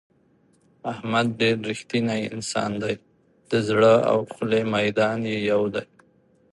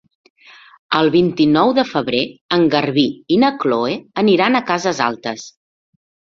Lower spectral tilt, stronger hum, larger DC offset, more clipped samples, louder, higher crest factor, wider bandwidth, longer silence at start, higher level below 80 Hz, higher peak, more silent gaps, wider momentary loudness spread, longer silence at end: about the same, -5.5 dB/octave vs -5.5 dB/octave; neither; neither; neither; second, -23 LUFS vs -16 LUFS; about the same, 18 dB vs 16 dB; first, 11.5 kHz vs 7.6 kHz; about the same, 0.85 s vs 0.9 s; about the same, -62 dBFS vs -58 dBFS; second, -6 dBFS vs 0 dBFS; second, none vs 2.41-2.49 s; first, 12 LU vs 7 LU; second, 0.7 s vs 0.9 s